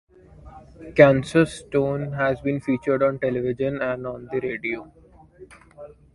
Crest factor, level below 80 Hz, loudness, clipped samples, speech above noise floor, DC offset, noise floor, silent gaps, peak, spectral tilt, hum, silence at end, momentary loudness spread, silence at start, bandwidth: 24 dB; -52 dBFS; -22 LUFS; under 0.1%; 26 dB; under 0.1%; -48 dBFS; none; 0 dBFS; -7 dB/octave; none; 0.3 s; 13 LU; 0.45 s; 11.5 kHz